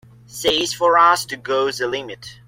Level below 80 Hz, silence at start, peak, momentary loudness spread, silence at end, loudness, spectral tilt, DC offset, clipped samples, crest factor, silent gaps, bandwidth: -56 dBFS; 0.3 s; -2 dBFS; 14 LU; 0.15 s; -18 LUFS; -2 dB/octave; under 0.1%; under 0.1%; 18 dB; none; 16.5 kHz